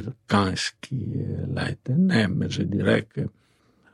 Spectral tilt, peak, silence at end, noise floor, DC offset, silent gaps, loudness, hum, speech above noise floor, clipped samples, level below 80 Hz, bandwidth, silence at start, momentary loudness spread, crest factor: -6 dB/octave; -8 dBFS; 0.65 s; -61 dBFS; under 0.1%; none; -25 LUFS; none; 36 dB; under 0.1%; -56 dBFS; 11.5 kHz; 0 s; 11 LU; 18 dB